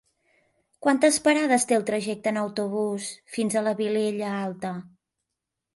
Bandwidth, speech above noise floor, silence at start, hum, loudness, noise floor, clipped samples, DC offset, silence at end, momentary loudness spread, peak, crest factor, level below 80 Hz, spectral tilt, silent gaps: 12 kHz; 60 dB; 0.8 s; none; -25 LUFS; -85 dBFS; under 0.1%; under 0.1%; 0.9 s; 12 LU; -8 dBFS; 18 dB; -70 dBFS; -4 dB/octave; none